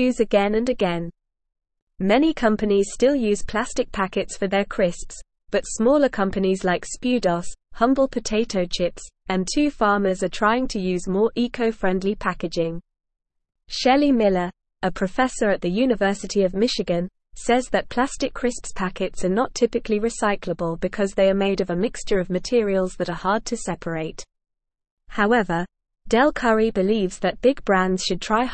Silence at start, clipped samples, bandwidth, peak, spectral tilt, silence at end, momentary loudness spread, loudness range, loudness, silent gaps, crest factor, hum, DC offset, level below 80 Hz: 0 s; under 0.1%; 8.8 kHz; -4 dBFS; -5 dB/octave; 0 s; 9 LU; 3 LU; -22 LUFS; 1.82-1.87 s, 24.91-24.97 s; 18 dB; none; 0.3%; -42 dBFS